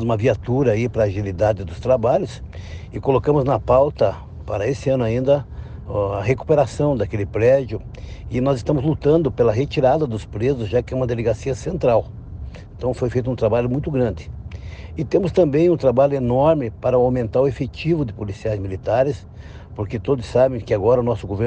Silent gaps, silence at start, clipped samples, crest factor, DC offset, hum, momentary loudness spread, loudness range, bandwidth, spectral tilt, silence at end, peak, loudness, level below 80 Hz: none; 0 s; under 0.1%; 16 dB; under 0.1%; none; 16 LU; 4 LU; 9 kHz; -8 dB/octave; 0 s; -4 dBFS; -20 LUFS; -38 dBFS